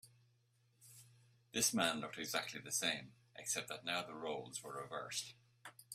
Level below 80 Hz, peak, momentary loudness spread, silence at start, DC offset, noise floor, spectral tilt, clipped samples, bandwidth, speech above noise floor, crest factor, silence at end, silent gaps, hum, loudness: -80 dBFS; -18 dBFS; 22 LU; 0.05 s; under 0.1%; -76 dBFS; -1.5 dB/octave; under 0.1%; 16 kHz; 34 dB; 26 dB; 0 s; none; none; -40 LUFS